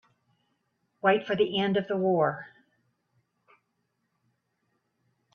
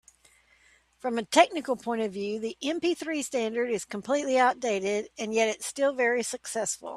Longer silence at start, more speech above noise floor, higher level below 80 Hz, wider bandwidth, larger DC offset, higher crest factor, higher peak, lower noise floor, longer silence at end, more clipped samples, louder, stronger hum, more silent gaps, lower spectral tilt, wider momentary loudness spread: about the same, 1.05 s vs 1.05 s; first, 52 dB vs 35 dB; about the same, -74 dBFS vs -70 dBFS; second, 6.6 kHz vs 15 kHz; neither; about the same, 22 dB vs 24 dB; second, -10 dBFS vs -4 dBFS; first, -78 dBFS vs -62 dBFS; first, 2.9 s vs 0 s; neither; about the same, -26 LUFS vs -28 LUFS; neither; neither; first, -7.5 dB/octave vs -2.5 dB/octave; second, 4 LU vs 9 LU